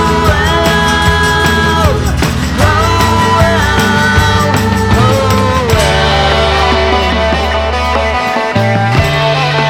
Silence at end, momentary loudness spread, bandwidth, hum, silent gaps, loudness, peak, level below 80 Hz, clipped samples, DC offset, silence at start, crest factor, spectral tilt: 0 s; 3 LU; 19.5 kHz; none; none; -10 LUFS; 0 dBFS; -20 dBFS; 0.1%; under 0.1%; 0 s; 10 dB; -5 dB/octave